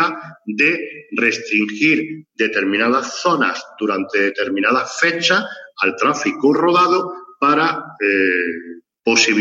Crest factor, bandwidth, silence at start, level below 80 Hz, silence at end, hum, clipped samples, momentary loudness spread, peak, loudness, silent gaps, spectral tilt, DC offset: 16 dB; 8 kHz; 0 s; -70 dBFS; 0 s; none; under 0.1%; 10 LU; 0 dBFS; -17 LUFS; none; -3 dB/octave; under 0.1%